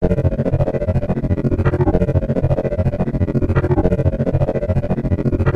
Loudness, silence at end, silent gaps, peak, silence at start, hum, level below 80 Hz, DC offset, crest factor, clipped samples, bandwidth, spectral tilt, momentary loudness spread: -18 LUFS; 0 s; none; -2 dBFS; 0 s; none; -26 dBFS; 2%; 14 dB; under 0.1%; 6 kHz; -10.5 dB/octave; 3 LU